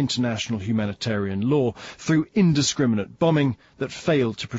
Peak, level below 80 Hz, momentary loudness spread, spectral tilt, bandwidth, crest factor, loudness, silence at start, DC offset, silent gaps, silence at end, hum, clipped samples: -8 dBFS; -56 dBFS; 8 LU; -5.5 dB/octave; 8 kHz; 14 dB; -23 LUFS; 0 s; under 0.1%; none; 0 s; none; under 0.1%